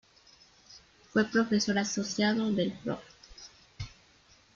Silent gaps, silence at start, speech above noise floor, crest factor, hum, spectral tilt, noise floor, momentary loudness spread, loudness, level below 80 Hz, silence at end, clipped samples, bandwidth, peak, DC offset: none; 0.7 s; 33 dB; 20 dB; none; -4.5 dB/octave; -62 dBFS; 22 LU; -30 LUFS; -62 dBFS; 0.65 s; under 0.1%; 7.6 kHz; -12 dBFS; under 0.1%